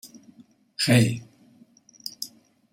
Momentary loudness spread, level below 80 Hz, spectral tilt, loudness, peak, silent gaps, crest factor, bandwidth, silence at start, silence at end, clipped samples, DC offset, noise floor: 21 LU; -62 dBFS; -5 dB/octave; -23 LUFS; -6 dBFS; none; 22 dB; 16 kHz; 0.05 s; 0.45 s; under 0.1%; under 0.1%; -56 dBFS